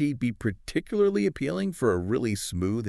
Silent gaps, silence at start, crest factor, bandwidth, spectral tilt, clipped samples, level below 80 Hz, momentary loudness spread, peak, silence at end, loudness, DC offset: none; 0 s; 16 dB; 13.5 kHz; -6 dB/octave; under 0.1%; -50 dBFS; 5 LU; -12 dBFS; 0 s; -27 LUFS; under 0.1%